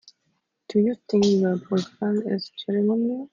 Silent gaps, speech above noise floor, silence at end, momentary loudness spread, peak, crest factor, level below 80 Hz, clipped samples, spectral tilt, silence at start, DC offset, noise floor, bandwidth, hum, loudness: none; 51 dB; 0.05 s; 7 LU; -10 dBFS; 14 dB; -68 dBFS; under 0.1%; -7 dB/octave; 0.7 s; under 0.1%; -73 dBFS; 7.4 kHz; none; -24 LUFS